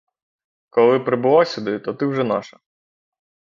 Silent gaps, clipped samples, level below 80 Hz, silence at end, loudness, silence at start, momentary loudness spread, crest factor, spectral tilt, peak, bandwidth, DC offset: none; under 0.1%; -66 dBFS; 1.1 s; -19 LUFS; 0.75 s; 9 LU; 18 dB; -7 dB/octave; -2 dBFS; 7.4 kHz; under 0.1%